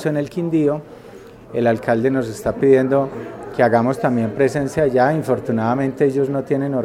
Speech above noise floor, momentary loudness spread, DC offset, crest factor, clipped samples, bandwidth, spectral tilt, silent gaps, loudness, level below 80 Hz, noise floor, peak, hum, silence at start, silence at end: 22 dB; 8 LU; under 0.1%; 18 dB; under 0.1%; 15 kHz; -7.5 dB/octave; none; -18 LUFS; -50 dBFS; -40 dBFS; -2 dBFS; none; 0 s; 0 s